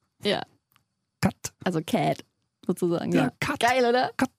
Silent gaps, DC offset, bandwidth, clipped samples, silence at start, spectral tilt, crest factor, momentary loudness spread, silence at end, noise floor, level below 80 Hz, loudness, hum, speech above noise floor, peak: none; under 0.1%; 15.5 kHz; under 0.1%; 0.25 s; -5 dB/octave; 18 dB; 10 LU; 0.1 s; -69 dBFS; -58 dBFS; -26 LUFS; none; 44 dB; -8 dBFS